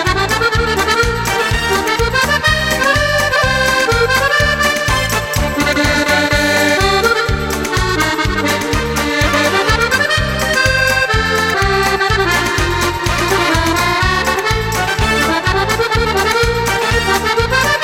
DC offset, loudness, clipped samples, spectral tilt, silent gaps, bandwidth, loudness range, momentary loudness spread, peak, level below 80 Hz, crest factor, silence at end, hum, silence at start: under 0.1%; -13 LUFS; under 0.1%; -3.5 dB/octave; none; 16.5 kHz; 1 LU; 4 LU; 0 dBFS; -26 dBFS; 14 dB; 0 s; none; 0 s